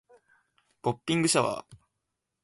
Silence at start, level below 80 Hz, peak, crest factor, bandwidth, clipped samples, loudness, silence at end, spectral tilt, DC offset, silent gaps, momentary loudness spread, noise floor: 0.85 s; -68 dBFS; -10 dBFS; 22 dB; 12 kHz; under 0.1%; -28 LUFS; 0.7 s; -4 dB/octave; under 0.1%; none; 10 LU; -83 dBFS